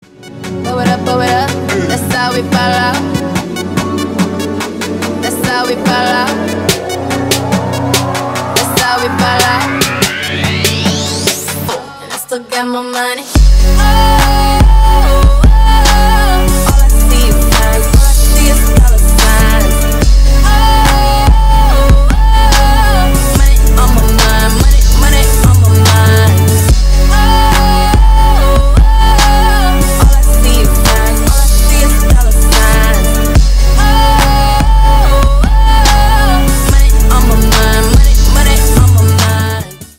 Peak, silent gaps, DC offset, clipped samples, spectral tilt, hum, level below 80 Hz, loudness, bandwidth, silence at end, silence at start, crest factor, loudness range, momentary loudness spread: 0 dBFS; none; under 0.1%; 0.3%; -4.5 dB/octave; none; -8 dBFS; -10 LUFS; 16.5 kHz; 0.15 s; 0.25 s; 8 dB; 5 LU; 7 LU